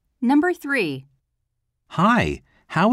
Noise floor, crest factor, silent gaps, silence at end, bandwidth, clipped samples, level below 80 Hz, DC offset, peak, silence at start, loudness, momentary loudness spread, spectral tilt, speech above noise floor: -75 dBFS; 16 dB; none; 0 s; 14 kHz; under 0.1%; -48 dBFS; under 0.1%; -8 dBFS; 0.2 s; -21 LUFS; 14 LU; -6.5 dB/octave; 55 dB